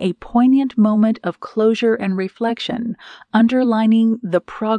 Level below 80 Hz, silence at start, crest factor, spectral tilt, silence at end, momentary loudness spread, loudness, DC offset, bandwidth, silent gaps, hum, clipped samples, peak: -54 dBFS; 0 s; 14 dB; -7.5 dB/octave; 0 s; 9 LU; -17 LUFS; under 0.1%; 8.8 kHz; none; none; under 0.1%; -4 dBFS